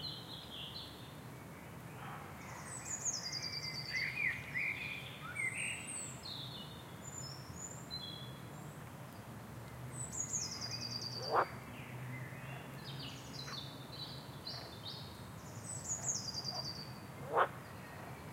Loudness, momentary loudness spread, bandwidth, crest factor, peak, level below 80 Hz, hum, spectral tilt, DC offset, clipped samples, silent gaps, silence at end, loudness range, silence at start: -42 LUFS; 14 LU; 16 kHz; 26 dB; -18 dBFS; -66 dBFS; none; -2.5 dB/octave; under 0.1%; under 0.1%; none; 0 s; 7 LU; 0 s